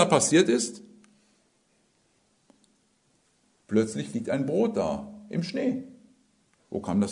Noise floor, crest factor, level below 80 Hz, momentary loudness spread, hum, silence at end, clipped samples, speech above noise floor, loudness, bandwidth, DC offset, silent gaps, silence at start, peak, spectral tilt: -68 dBFS; 24 dB; -66 dBFS; 15 LU; none; 0 s; under 0.1%; 43 dB; -27 LUFS; 11 kHz; under 0.1%; none; 0 s; -4 dBFS; -4.5 dB/octave